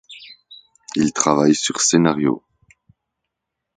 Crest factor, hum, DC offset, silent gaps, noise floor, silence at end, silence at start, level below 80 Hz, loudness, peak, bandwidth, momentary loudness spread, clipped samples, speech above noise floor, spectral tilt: 20 dB; none; under 0.1%; none; -80 dBFS; 1.4 s; 0.1 s; -60 dBFS; -18 LUFS; 0 dBFS; 9.6 kHz; 23 LU; under 0.1%; 63 dB; -4 dB/octave